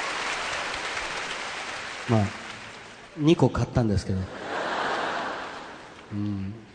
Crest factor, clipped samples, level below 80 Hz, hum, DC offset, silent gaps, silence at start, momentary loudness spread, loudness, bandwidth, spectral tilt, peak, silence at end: 22 dB; under 0.1%; -48 dBFS; none; under 0.1%; none; 0 s; 16 LU; -28 LUFS; 10 kHz; -5.5 dB/octave; -6 dBFS; 0 s